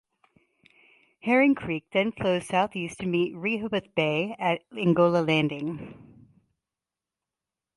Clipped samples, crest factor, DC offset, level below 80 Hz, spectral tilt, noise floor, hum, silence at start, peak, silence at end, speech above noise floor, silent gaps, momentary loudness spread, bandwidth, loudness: under 0.1%; 18 dB; under 0.1%; -64 dBFS; -6.5 dB/octave; -90 dBFS; none; 1.25 s; -10 dBFS; 1.8 s; 64 dB; none; 11 LU; 11.5 kHz; -26 LUFS